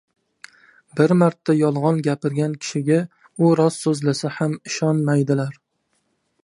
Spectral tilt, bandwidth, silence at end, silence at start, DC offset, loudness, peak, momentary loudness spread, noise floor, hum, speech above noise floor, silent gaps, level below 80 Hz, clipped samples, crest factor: -6.5 dB/octave; 11.5 kHz; 0.9 s; 0.95 s; under 0.1%; -20 LUFS; -2 dBFS; 7 LU; -70 dBFS; none; 51 dB; none; -68 dBFS; under 0.1%; 18 dB